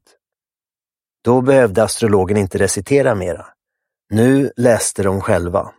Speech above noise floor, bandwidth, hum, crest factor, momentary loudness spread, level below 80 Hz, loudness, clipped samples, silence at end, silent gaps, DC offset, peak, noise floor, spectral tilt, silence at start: over 75 dB; 16 kHz; none; 16 dB; 9 LU; -46 dBFS; -15 LUFS; under 0.1%; 0.1 s; none; under 0.1%; 0 dBFS; under -90 dBFS; -5.5 dB/octave; 1.25 s